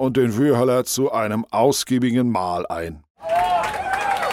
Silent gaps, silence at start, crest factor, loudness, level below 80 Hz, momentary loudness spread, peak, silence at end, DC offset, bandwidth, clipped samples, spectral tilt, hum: 3.10-3.15 s; 0 s; 16 dB; -20 LUFS; -50 dBFS; 8 LU; -4 dBFS; 0 s; under 0.1%; 16 kHz; under 0.1%; -5 dB/octave; none